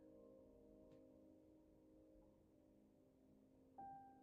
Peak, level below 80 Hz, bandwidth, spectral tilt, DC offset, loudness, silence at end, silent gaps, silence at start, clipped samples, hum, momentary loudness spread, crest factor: -50 dBFS; -82 dBFS; 2.8 kHz; -5 dB/octave; under 0.1%; -65 LUFS; 0 s; none; 0 s; under 0.1%; none; 9 LU; 18 dB